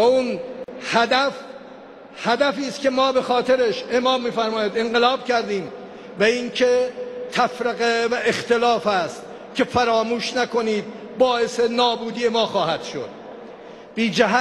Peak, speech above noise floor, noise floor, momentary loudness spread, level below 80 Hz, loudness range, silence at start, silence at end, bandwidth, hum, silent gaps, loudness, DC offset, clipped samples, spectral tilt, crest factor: -2 dBFS; 21 dB; -41 dBFS; 16 LU; -60 dBFS; 2 LU; 0 s; 0 s; 12 kHz; none; none; -21 LUFS; under 0.1%; under 0.1%; -4 dB/octave; 18 dB